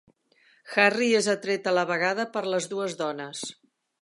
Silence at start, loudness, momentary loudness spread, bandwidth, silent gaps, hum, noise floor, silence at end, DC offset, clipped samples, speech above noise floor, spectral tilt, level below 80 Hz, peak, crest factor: 0.65 s; -25 LUFS; 13 LU; 11.5 kHz; none; none; -63 dBFS; 0.5 s; under 0.1%; under 0.1%; 37 dB; -3.5 dB/octave; -80 dBFS; -4 dBFS; 22 dB